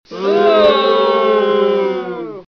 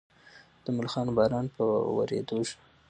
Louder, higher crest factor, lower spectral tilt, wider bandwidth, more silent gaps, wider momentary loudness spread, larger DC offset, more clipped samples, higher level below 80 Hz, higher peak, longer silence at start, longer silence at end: first, -13 LUFS vs -29 LUFS; second, 10 dB vs 18 dB; about the same, -6 dB/octave vs -6.5 dB/octave; second, 6.4 kHz vs 9.6 kHz; neither; first, 12 LU vs 8 LU; first, 0.1% vs under 0.1%; neither; first, -54 dBFS vs -60 dBFS; first, -4 dBFS vs -12 dBFS; second, 0.1 s vs 0.35 s; second, 0.1 s vs 0.35 s